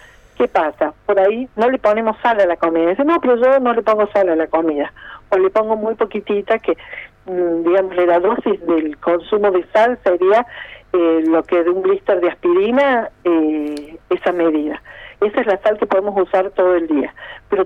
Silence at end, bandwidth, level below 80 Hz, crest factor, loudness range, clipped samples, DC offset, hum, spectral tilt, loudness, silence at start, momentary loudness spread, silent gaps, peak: 0 s; 6.6 kHz; -52 dBFS; 12 dB; 3 LU; under 0.1%; under 0.1%; none; -7 dB/octave; -16 LUFS; 0.4 s; 8 LU; none; -4 dBFS